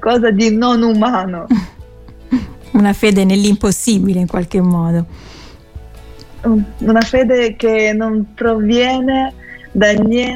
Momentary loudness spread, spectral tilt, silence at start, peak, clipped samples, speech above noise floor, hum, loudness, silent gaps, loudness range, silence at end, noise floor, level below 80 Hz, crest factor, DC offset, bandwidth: 8 LU; -5.5 dB/octave; 0 s; 0 dBFS; under 0.1%; 23 dB; none; -14 LUFS; none; 3 LU; 0 s; -36 dBFS; -36 dBFS; 14 dB; under 0.1%; 16 kHz